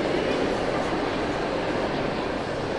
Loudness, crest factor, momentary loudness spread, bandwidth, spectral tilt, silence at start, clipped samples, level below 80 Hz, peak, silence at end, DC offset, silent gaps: -26 LUFS; 14 dB; 3 LU; 11.5 kHz; -5.5 dB/octave; 0 s; under 0.1%; -44 dBFS; -12 dBFS; 0 s; under 0.1%; none